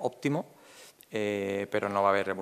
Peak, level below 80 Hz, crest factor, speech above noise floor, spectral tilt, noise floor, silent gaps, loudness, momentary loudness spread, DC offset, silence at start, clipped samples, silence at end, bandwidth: -12 dBFS; -82 dBFS; 20 dB; 24 dB; -6 dB/octave; -54 dBFS; none; -30 LUFS; 21 LU; under 0.1%; 0 s; under 0.1%; 0 s; 14.5 kHz